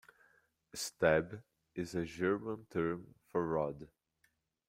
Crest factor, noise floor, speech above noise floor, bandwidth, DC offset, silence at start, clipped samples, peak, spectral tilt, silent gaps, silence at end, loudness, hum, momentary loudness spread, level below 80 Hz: 24 dB; -78 dBFS; 42 dB; 16 kHz; under 0.1%; 0.75 s; under 0.1%; -14 dBFS; -5 dB/octave; none; 0.85 s; -37 LUFS; none; 18 LU; -66 dBFS